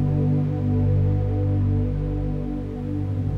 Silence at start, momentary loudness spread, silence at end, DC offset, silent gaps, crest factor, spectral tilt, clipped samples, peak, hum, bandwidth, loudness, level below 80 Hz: 0 s; 7 LU; 0 s; under 0.1%; none; 10 dB; -11 dB/octave; under 0.1%; -12 dBFS; 50 Hz at -35 dBFS; 3.6 kHz; -24 LUFS; -32 dBFS